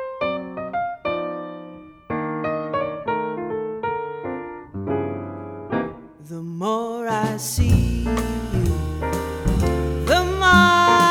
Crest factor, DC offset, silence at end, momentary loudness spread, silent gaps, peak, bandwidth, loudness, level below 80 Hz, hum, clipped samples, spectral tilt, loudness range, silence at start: 20 dB; under 0.1%; 0 s; 17 LU; none; -2 dBFS; 17.5 kHz; -22 LUFS; -32 dBFS; none; under 0.1%; -5 dB/octave; 9 LU; 0 s